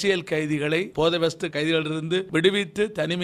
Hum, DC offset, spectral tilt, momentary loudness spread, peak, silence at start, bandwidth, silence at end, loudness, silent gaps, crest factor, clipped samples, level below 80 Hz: none; under 0.1%; -5 dB/octave; 5 LU; -6 dBFS; 0 s; 14 kHz; 0 s; -24 LUFS; none; 18 dB; under 0.1%; -56 dBFS